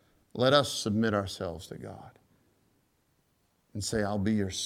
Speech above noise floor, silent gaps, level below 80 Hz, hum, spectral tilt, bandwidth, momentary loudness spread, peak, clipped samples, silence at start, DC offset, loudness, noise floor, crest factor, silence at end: 42 dB; none; -60 dBFS; none; -4.5 dB/octave; 16 kHz; 20 LU; -8 dBFS; under 0.1%; 0.35 s; under 0.1%; -29 LUFS; -72 dBFS; 24 dB; 0 s